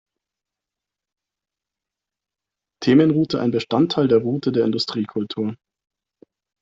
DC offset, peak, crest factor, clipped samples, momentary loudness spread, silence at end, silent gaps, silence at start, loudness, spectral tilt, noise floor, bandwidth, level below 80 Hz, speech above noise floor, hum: under 0.1%; -4 dBFS; 18 dB; under 0.1%; 10 LU; 1.05 s; none; 2.8 s; -20 LUFS; -7 dB/octave; -87 dBFS; 7.8 kHz; -60 dBFS; 68 dB; none